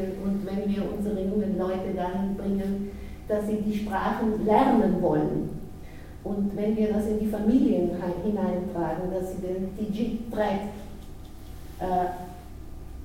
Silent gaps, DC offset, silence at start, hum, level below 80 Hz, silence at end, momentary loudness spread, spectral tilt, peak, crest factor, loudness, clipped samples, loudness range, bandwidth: none; under 0.1%; 0 s; none; -42 dBFS; 0 s; 21 LU; -8 dB/octave; -8 dBFS; 18 dB; -27 LUFS; under 0.1%; 6 LU; 16 kHz